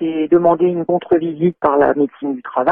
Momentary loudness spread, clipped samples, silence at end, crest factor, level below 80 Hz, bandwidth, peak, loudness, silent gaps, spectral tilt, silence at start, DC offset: 6 LU; under 0.1%; 0 s; 12 dB; -54 dBFS; 3.6 kHz; -2 dBFS; -16 LUFS; none; -10.5 dB/octave; 0 s; under 0.1%